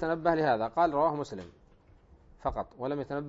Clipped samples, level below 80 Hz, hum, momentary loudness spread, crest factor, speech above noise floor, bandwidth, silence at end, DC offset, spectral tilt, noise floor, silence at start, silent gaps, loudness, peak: under 0.1%; -54 dBFS; none; 11 LU; 20 dB; 29 dB; 8 kHz; 0 s; under 0.1%; -7 dB/octave; -59 dBFS; 0 s; none; -30 LUFS; -12 dBFS